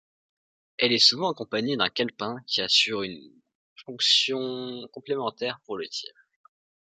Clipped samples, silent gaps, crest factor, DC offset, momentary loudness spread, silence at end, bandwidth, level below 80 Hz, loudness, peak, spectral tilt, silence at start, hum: under 0.1%; 3.55-3.76 s; 24 dB; under 0.1%; 18 LU; 0.85 s; 9.6 kHz; -72 dBFS; -24 LUFS; -4 dBFS; -2.5 dB/octave; 0.8 s; none